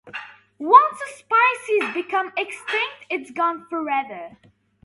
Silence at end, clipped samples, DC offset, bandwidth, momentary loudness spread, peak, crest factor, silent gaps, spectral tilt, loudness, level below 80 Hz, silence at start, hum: 0.55 s; under 0.1%; under 0.1%; 11.5 kHz; 20 LU; 0 dBFS; 22 dB; none; -2.5 dB/octave; -20 LUFS; -74 dBFS; 0.05 s; none